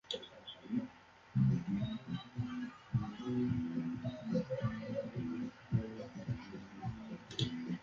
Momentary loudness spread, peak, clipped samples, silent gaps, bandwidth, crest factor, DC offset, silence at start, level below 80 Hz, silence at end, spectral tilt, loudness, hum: 10 LU; -22 dBFS; under 0.1%; none; 7.4 kHz; 18 dB; under 0.1%; 0.05 s; -62 dBFS; 0 s; -7 dB/octave; -40 LUFS; none